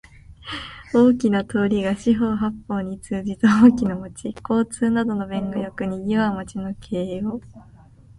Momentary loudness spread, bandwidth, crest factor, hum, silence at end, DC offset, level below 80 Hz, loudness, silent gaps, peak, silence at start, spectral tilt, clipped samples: 16 LU; 11.5 kHz; 20 dB; none; 0.55 s; under 0.1%; -48 dBFS; -21 LUFS; none; -2 dBFS; 0.3 s; -6.5 dB/octave; under 0.1%